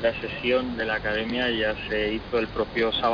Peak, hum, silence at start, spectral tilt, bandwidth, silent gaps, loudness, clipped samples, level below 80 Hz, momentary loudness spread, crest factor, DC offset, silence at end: -12 dBFS; none; 0 s; -6.5 dB/octave; 5.4 kHz; none; -26 LUFS; under 0.1%; -44 dBFS; 3 LU; 14 dB; under 0.1%; 0 s